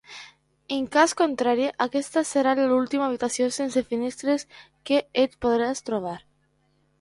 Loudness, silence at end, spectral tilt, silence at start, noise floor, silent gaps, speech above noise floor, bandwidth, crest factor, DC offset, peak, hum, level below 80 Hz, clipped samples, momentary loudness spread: -24 LUFS; 0.85 s; -3.5 dB/octave; 0.1 s; -67 dBFS; none; 43 dB; 11.5 kHz; 20 dB; under 0.1%; -4 dBFS; none; -60 dBFS; under 0.1%; 11 LU